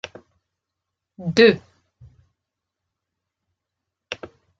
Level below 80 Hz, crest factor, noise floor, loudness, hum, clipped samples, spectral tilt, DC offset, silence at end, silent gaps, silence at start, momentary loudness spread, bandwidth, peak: -62 dBFS; 24 dB; -83 dBFS; -18 LUFS; none; under 0.1%; -5.5 dB/octave; under 0.1%; 0.45 s; none; 1.2 s; 20 LU; 7.6 kHz; -2 dBFS